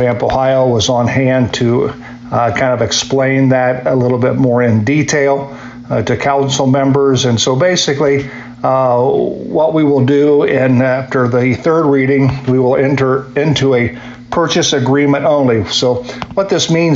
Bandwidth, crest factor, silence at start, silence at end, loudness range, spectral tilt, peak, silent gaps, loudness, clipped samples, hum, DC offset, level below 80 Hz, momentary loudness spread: 7.8 kHz; 10 dB; 0 s; 0 s; 1 LU; -5.5 dB/octave; -2 dBFS; none; -12 LUFS; under 0.1%; none; under 0.1%; -42 dBFS; 6 LU